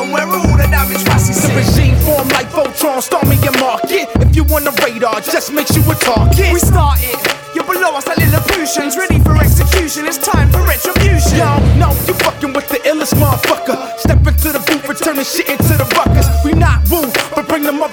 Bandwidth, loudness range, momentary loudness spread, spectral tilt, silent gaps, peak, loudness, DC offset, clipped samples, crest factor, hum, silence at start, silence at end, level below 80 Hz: 19 kHz; 1 LU; 5 LU; -5 dB/octave; none; 0 dBFS; -12 LUFS; under 0.1%; under 0.1%; 12 dB; none; 0 s; 0 s; -18 dBFS